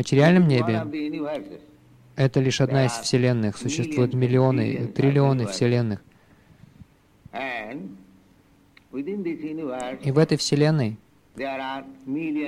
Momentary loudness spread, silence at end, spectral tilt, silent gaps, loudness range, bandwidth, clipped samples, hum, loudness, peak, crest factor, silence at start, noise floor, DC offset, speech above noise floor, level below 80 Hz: 14 LU; 0 s; -6.5 dB/octave; none; 12 LU; 12 kHz; under 0.1%; none; -23 LUFS; -6 dBFS; 18 dB; 0 s; -57 dBFS; under 0.1%; 35 dB; -60 dBFS